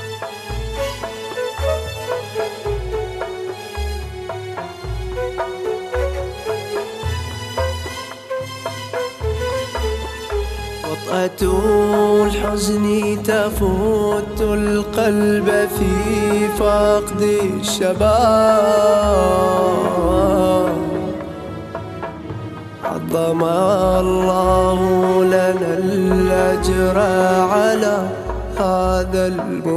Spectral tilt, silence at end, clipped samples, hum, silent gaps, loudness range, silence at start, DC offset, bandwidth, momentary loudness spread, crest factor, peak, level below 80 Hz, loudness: -5.5 dB/octave; 0 s; under 0.1%; none; none; 10 LU; 0 s; under 0.1%; 15 kHz; 13 LU; 16 dB; -2 dBFS; -30 dBFS; -18 LUFS